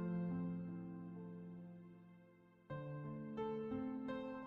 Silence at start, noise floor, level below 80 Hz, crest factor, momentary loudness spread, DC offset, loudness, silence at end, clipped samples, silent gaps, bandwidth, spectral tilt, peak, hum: 0 s; -67 dBFS; -74 dBFS; 14 dB; 18 LU; under 0.1%; -47 LUFS; 0 s; under 0.1%; none; 4.5 kHz; -8.5 dB/octave; -32 dBFS; none